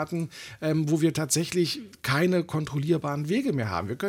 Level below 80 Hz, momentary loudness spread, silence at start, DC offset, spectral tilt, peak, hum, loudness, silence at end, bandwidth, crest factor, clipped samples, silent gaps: -62 dBFS; 8 LU; 0 s; under 0.1%; -5 dB/octave; -10 dBFS; none; -27 LUFS; 0 s; 17 kHz; 16 dB; under 0.1%; none